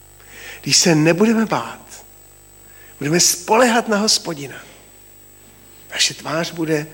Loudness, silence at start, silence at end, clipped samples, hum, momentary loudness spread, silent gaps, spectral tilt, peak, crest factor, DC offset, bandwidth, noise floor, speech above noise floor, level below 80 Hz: -16 LUFS; 0.3 s; 0 s; under 0.1%; 50 Hz at -50 dBFS; 21 LU; none; -3 dB/octave; -2 dBFS; 18 dB; under 0.1%; 17 kHz; -45 dBFS; 28 dB; -54 dBFS